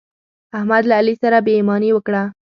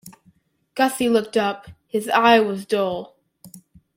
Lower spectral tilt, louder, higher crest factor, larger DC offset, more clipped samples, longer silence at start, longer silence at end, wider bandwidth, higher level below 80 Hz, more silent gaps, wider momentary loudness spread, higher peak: first, -8.5 dB/octave vs -4 dB/octave; first, -16 LUFS vs -20 LUFS; about the same, 16 dB vs 20 dB; neither; neither; first, 0.55 s vs 0.05 s; second, 0.2 s vs 0.4 s; second, 6 kHz vs 16.5 kHz; about the same, -66 dBFS vs -62 dBFS; neither; second, 8 LU vs 15 LU; about the same, -2 dBFS vs -2 dBFS